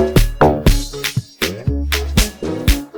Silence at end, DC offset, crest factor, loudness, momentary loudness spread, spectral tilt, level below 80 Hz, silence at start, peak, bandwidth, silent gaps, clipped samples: 0 s; under 0.1%; 14 dB; -17 LUFS; 8 LU; -5 dB/octave; -20 dBFS; 0 s; -2 dBFS; over 20 kHz; none; under 0.1%